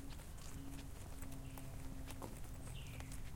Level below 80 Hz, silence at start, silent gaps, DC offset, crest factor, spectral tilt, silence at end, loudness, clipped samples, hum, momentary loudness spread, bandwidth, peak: -52 dBFS; 0 s; none; under 0.1%; 18 dB; -5 dB/octave; 0 s; -52 LUFS; under 0.1%; none; 2 LU; 17 kHz; -30 dBFS